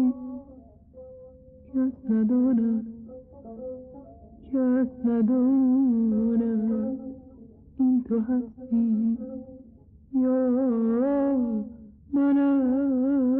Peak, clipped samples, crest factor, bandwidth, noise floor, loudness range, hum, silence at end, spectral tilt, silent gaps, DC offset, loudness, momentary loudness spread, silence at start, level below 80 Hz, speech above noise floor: -16 dBFS; under 0.1%; 10 dB; 3 kHz; -52 dBFS; 4 LU; none; 0 s; -10 dB/octave; none; under 0.1%; -25 LUFS; 19 LU; 0 s; -56 dBFS; 28 dB